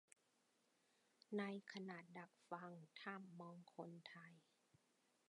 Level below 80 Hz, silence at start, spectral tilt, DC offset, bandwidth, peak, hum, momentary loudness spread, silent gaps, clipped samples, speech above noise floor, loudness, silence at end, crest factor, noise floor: under -90 dBFS; 1.3 s; -6 dB/octave; under 0.1%; 11 kHz; -34 dBFS; none; 12 LU; none; under 0.1%; 29 dB; -55 LUFS; 0.85 s; 22 dB; -83 dBFS